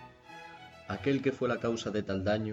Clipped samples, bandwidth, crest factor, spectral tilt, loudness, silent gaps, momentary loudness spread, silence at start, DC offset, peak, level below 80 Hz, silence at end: under 0.1%; 8.2 kHz; 16 dB; -6 dB/octave; -32 LUFS; none; 19 LU; 0 s; under 0.1%; -16 dBFS; -64 dBFS; 0 s